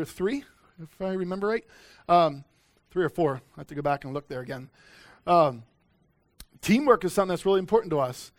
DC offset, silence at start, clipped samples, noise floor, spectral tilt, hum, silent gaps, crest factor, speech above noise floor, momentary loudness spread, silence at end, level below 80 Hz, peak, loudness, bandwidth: under 0.1%; 0 s; under 0.1%; -67 dBFS; -6 dB/octave; none; none; 22 dB; 41 dB; 16 LU; 0.1 s; -58 dBFS; -6 dBFS; -26 LUFS; 18 kHz